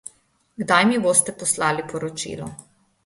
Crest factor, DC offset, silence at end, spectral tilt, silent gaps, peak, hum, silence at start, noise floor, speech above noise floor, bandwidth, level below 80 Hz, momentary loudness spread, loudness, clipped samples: 20 dB; under 0.1%; 0.45 s; -3 dB/octave; none; -2 dBFS; none; 0.6 s; -58 dBFS; 37 dB; 12 kHz; -60 dBFS; 17 LU; -20 LUFS; under 0.1%